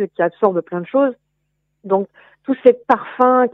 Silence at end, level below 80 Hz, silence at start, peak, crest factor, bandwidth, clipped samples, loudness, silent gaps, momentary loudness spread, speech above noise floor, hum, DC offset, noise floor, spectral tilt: 0.05 s; -66 dBFS; 0 s; 0 dBFS; 18 dB; 4 kHz; under 0.1%; -17 LUFS; none; 10 LU; 54 dB; 50 Hz at -70 dBFS; under 0.1%; -70 dBFS; -9 dB/octave